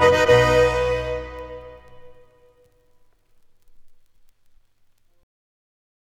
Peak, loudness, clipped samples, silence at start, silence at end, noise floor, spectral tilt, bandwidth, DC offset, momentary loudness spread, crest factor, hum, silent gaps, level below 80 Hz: -2 dBFS; -18 LUFS; under 0.1%; 0 s; 2.3 s; -58 dBFS; -5 dB/octave; 13.5 kHz; under 0.1%; 24 LU; 22 dB; none; none; -40 dBFS